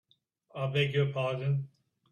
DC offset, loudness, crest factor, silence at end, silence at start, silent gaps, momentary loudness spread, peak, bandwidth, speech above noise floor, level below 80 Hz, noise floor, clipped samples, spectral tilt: under 0.1%; -31 LUFS; 18 dB; 0.45 s; 0.55 s; none; 15 LU; -16 dBFS; 7 kHz; 39 dB; -70 dBFS; -69 dBFS; under 0.1%; -7.5 dB/octave